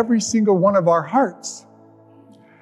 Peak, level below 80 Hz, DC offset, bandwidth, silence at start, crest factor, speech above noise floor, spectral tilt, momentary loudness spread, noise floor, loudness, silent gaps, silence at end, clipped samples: -4 dBFS; -68 dBFS; under 0.1%; 11.5 kHz; 0 s; 16 dB; 31 dB; -5.5 dB/octave; 17 LU; -48 dBFS; -17 LUFS; none; 1.05 s; under 0.1%